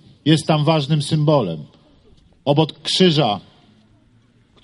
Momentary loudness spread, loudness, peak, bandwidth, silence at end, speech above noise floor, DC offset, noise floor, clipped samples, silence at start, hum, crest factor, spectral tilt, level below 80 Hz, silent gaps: 12 LU; -18 LUFS; -2 dBFS; 11.5 kHz; 1.25 s; 38 dB; under 0.1%; -55 dBFS; under 0.1%; 0.25 s; none; 18 dB; -6 dB/octave; -58 dBFS; none